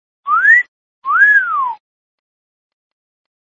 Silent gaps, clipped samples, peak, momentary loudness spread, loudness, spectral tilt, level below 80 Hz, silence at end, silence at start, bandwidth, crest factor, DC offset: 0.68-1.02 s; under 0.1%; 0 dBFS; 16 LU; -11 LUFS; 0 dB/octave; -76 dBFS; 1.85 s; 0.25 s; 7.4 kHz; 16 dB; under 0.1%